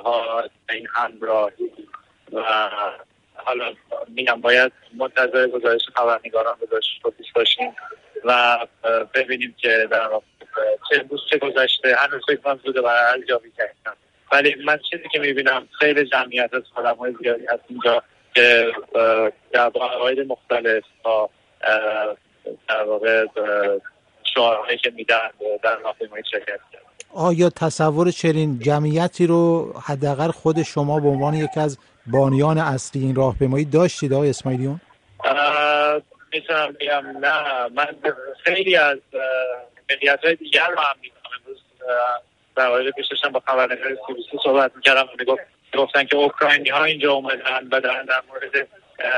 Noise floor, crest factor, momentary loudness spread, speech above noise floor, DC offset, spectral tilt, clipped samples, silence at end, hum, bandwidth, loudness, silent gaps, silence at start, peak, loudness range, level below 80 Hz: -45 dBFS; 20 dB; 11 LU; 25 dB; under 0.1%; -5 dB/octave; under 0.1%; 0 s; none; 10.5 kHz; -20 LUFS; none; 0 s; 0 dBFS; 4 LU; -56 dBFS